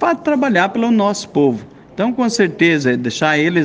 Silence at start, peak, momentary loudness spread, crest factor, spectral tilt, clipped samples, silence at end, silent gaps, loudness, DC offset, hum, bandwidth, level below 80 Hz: 0 s; 0 dBFS; 6 LU; 14 dB; -5 dB/octave; under 0.1%; 0 s; none; -15 LUFS; under 0.1%; none; 9.8 kHz; -58 dBFS